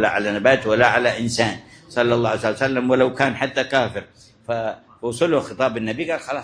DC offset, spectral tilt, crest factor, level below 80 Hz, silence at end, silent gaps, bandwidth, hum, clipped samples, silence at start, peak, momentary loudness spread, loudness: under 0.1%; -5 dB/octave; 20 dB; -54 dBFS; 0 s; none; 10.5 kHz; none; under 0.1%; 0 s; 0 dBFS; 12 LU; -20 LUFS